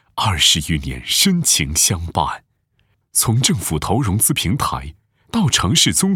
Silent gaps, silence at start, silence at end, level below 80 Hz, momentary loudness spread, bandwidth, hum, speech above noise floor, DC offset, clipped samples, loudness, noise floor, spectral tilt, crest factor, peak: none; 0.15 s; 0 s; -38 dBFS; 10 LU; over 20 kHz; none; 46 dB; under 0.1%; under 0.1%; -16 LUFS; -63 dBFS; -3 dB/octave; 16 dB; -2 dBFS